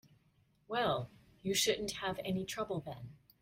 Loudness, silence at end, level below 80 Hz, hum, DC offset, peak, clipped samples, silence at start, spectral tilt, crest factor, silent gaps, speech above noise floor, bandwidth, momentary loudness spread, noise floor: -36 LUFS; 0.25 s; -66 dBFS; none; under 0.1%; -20 dBFS; under 0.1%; 0.7 s; -3.5 dB/octave; 20 dB; none; 35 dB; 16 kHz; 17 LU; -72 dBFS